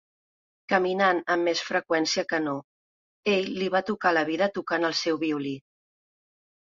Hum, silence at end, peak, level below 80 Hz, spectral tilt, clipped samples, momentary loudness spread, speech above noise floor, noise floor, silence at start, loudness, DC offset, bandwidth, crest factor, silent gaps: none; 1.15 s; -6 dBFS; -72 dBFS; -4 dB/octave; under 0.1%; 8 LU; over 65 dB; under -90 dBFS; 0.7 s; -26 LUFS; under 0.1%; 7.6 kHz; 20 dB; 2.64-3.23 s